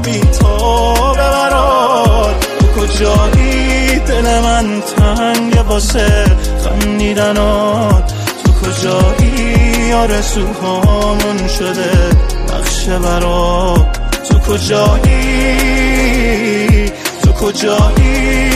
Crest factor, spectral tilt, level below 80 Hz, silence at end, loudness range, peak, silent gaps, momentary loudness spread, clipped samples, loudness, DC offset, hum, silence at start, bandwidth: 10 dB; -5 dB/octave; -14 dBFS; 0 s; 2 LU; 0 dBFS; none; 4 LU; under 0.1%; -12 LUFS; under 0.1%; none; 0 s; 15.5 kHz